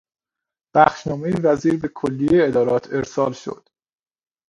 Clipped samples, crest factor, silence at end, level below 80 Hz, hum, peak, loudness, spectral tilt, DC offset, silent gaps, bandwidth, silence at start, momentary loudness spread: under 0.1%; 20 dB; 0.95 s; -52 dBFS; none; 0 dBFS; -19 LUFS; -7 dB/octave; under 0.1%; none; 11 kHz; 0.75 s; 9 LU